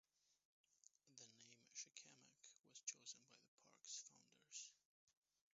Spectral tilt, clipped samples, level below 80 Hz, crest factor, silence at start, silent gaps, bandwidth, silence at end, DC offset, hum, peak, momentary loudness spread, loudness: 0 dB/octave; under 0.1%; under -90 dBFS; 28 dB; 0.25 s; 0.45-0.64 s, 3.48-3.58 s, 4.85-5.07 s; 7.6 kHz; 0.45 s; under 0.1%; none; -36 dBFS; 14 LU; -59 LUFS